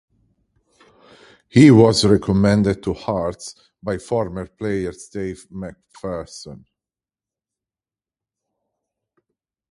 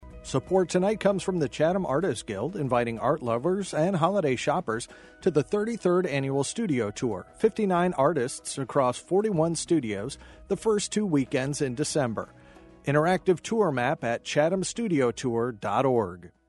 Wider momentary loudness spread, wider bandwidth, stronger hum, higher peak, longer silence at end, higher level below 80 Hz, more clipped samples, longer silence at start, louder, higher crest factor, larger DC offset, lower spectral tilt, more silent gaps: first, 23 LU vs 8 LU; about the same, 11.5 kHz vs 11.5 kHz; neither; first, 0 dBFS vs -8 dBFS; first, 3.15 s vs 0.2 s; first, -46 dBFS vs -56 dBFS; neither; first, 1.55 s vs 0 s; first, -18 LUFS vs -27 LUFS; about the same, 20 dB vs 18 dB; neither; about the same, -6.5 dB/octave vs -5.5 dB/octave; neither